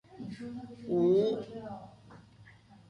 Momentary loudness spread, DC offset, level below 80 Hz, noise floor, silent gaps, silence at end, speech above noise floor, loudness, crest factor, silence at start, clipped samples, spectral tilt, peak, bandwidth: 19 LU; under 0.1%; -68 dBFS; -57 dBFS; none; 0.15 s; 23 dB; -31 LUFS; 16 dB; 0.1 s; under 0.1%; -8.5 dB/octave; -18 dBFS; 9.4 kHz